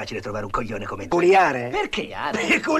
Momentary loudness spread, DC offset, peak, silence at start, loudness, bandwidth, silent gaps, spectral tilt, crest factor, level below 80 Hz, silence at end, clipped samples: 13 LU; under 0.1%; -8 dBFS; 0 s; -22 LUFS; 13 kHz; none; -4.5 dB/octave; 14 dB; -44 dBFS; 0 s; under 0.1%